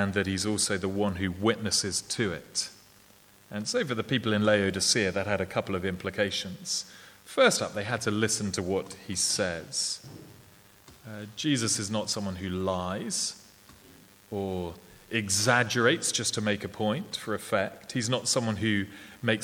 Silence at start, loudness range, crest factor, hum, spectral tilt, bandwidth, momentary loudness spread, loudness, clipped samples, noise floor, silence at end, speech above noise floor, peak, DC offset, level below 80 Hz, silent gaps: 0 s; 4 LU; 22 dB; none; -3.5 dB/octave; 19.5 kHz; 11 LU; -28 LUFS; under 0.1%; -57 dBFS; 0 s; 28 dB; -8 dBFS; under 0.1%; -62 dBFS; none